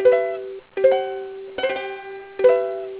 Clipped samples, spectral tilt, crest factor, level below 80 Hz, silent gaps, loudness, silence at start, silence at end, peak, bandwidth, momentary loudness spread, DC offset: under 0.1%; -7.5 dB/octave; 18 dB; -64 dBFS; none; -21 LUFS; 0 s; 0 s; -4 dBFS; 4 kHz; 14 LU; under 0.1%